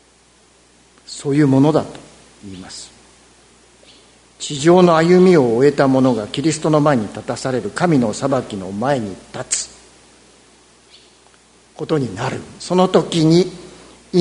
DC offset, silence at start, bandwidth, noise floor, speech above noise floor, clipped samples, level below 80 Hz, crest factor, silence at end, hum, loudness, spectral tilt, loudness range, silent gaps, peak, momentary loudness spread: under 0.1%; 1.1 s; 11 kHz; -52 dBFS; 36 dB; under 0.1%; -54 dBFS; 18 dB; 0 s; none; -16 LUFS; -6 dB/octave; 12 LU; none; 0 dBFS; 20 LU